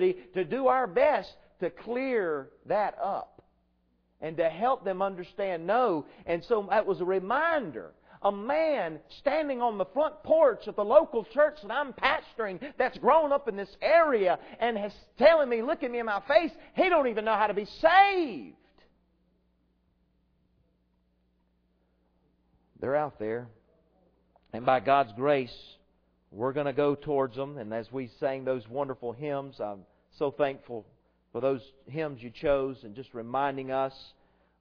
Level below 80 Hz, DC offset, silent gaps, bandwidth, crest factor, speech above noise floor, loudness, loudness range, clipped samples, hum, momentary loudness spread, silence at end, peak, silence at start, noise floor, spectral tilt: -60 dBFS; under 0.1%; none; 5.4 kHz; 22 dB; 43 dB; -28 LUFS; 9 LU; under 0.1%; none; 14 LU; 0.55 s; -8 dBFS; 0 s; -71 dBFS; -7.5 dB/octave